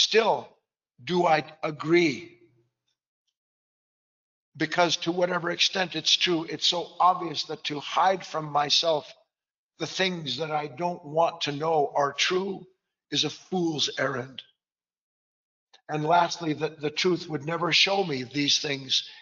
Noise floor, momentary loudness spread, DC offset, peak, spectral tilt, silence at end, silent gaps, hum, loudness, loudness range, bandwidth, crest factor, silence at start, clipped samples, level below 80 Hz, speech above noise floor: under -90 dBFS; 10 LU; under 0.1%; -8 dBFS; -2 dB/octave; 0 s; 3.07-3.26 s, 3.37-4.52 s, 9.58-9.69 s, 14.98-15.67 s; none; -25 LUFS; 6 LU; 7.6 kHz; 20 dB; 0 s; under 0.1%; -76 dBFS; over 64 dB